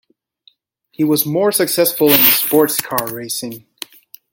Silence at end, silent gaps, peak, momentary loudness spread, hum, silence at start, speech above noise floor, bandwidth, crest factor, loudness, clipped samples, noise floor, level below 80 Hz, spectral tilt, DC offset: 0.75 s; none; 0 dBFS; 22 LU; none; 1 s; 40 dB; 17 kHz; 18 dB; -14 LUFS; under 0.1%; -55 dBFS; -60 dBFS; -3.5 dB/octave; under 0.1%